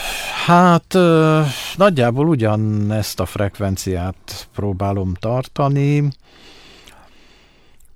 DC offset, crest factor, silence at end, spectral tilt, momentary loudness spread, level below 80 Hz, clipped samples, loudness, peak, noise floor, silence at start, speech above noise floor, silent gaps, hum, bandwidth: under 0.1%; 16 dB; 1.85 s; -6.5 dB/octave; 11 LU; -44 dBFS; under 0.1%; -17 LUFS; -2 dBFS; -48 dBFS; 0 s; 32 dB; none; none; 16.5 kHz